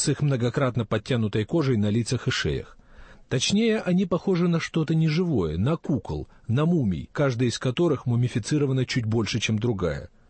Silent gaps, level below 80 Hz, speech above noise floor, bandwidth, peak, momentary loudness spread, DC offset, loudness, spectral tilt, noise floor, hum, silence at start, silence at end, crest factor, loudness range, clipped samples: none; -48 dBFS; 24 dB; 8.8 kHz; -12 dBFS; 5 LU; under 0.1%; -25 LUFS; -6 dB/octave; -48 dBFS; none; 0 s; 0.25 s; 12 dB; 1 LU; under 0.1%